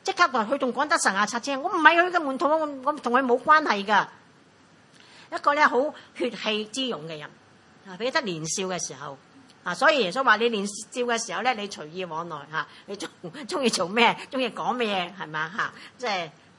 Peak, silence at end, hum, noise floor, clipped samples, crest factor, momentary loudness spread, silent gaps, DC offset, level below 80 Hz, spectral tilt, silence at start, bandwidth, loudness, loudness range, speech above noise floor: 0 dBFS; 0.3 s; none; -56 dBFS; under 0.1%; 26 dB; 15 LU; none; under 0.1%; -78 dBFS; -2.5 dB/octave; 0.05 s; 11.5 kHz; -24 LUFS; 7 LU; 31 dB